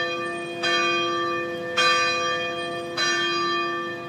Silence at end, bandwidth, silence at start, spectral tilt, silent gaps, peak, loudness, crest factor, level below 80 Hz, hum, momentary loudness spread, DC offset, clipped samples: 0 s; 14.5 kHz; 0 s; -2 dB/octave; none; -8 dBFS; -23 LUFS; 18 dB; -70 dBFS; none; 8 LU; under 0.1%; under 0.1%